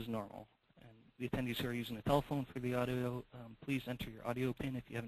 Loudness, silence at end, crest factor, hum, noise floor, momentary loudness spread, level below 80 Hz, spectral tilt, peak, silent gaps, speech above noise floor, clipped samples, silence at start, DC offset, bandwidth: -40 LUFS; 0 s; 20 dB; none; -63 dBFS; 12 LU; -60 dBFS; -6.5 dB/octave; -20 dBFS; none; 23 dB; under 0.1%; 0 s; under 0.1%; 13 kHz